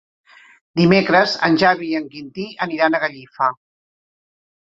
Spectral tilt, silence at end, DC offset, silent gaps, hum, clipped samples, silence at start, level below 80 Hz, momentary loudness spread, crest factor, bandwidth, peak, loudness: -6.5 dB/octave; 1.15 s; under 0.1%; none; none; under 0.1%; 0.75 s; -56 dBFS; 13 LU; 18 dB; 7.8 kHz; -2 dBFS; -17 LUFS